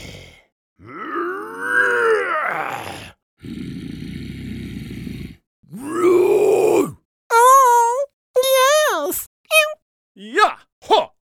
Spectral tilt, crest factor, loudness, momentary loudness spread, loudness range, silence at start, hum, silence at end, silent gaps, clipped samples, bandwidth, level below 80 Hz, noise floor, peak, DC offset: -3 dB/octave; 18 dB; -17 LUFS; 19 LU; 12 LU; 0 s; none; 0.15 s; 0.52-0.76 s, 3.23-3.37 s, 5.47-5.63 s, 7.05-7.30 s, 8.13-8.34 s, 9.26-9.44 s, 9.82-10.15 s, 10.72-10.81 s; under 0.1%; 19 kHz; -50 dBFS; -39 dBFS; -2 dBFS; under 0.1%